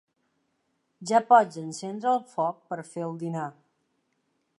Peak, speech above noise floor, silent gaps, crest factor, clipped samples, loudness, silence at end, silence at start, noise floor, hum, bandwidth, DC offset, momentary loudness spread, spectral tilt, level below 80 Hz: -6 dBFS; 49 dB; none; 22 dB; under 0.1%; -26 LUFS; 1.1 s; 1 s; -75 dBFS; none; 11.5 kHz; under 0.1%; 17 LU; -5.5 dB/octave; -84 dBFS